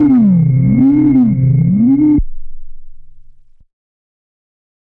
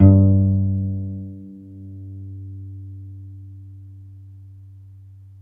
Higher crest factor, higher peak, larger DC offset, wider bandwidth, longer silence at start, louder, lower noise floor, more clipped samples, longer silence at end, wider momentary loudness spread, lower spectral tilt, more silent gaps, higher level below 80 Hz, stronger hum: second, 10 dB vs 20 dB; second, -4 dBFS vs 0 dBFS; neither; first, 2.4 kHz vs 1.4 kHz; about the same, 0 s vs 0 s; first, -11 LUFS vs -19 LUFS; second, -39 dBFS vs -43 dBFS; neither; first, 1.7 s vs 1.55 s; second, 3 LU vs 26 LU; about the same, -13.5 dB/octave vs -14.5 dB/octave; neither; first, -30 dBFS vs -48 dBFS; neither